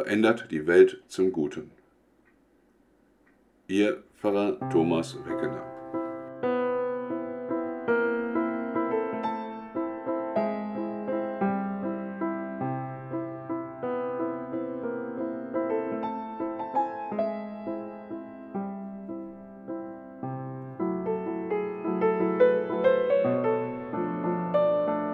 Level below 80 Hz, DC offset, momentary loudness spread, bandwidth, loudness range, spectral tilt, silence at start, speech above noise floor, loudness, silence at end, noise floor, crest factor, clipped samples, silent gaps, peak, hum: -68 dBFS; under 0.1%; 13 LU; 11.5 kHz; 8 LU; -7 dB/octave; 0 s; 38 dB; -29 LUFS; 0 s; -63 dBFS; 22 dB; under 0.1%; none; -6 dBFS; none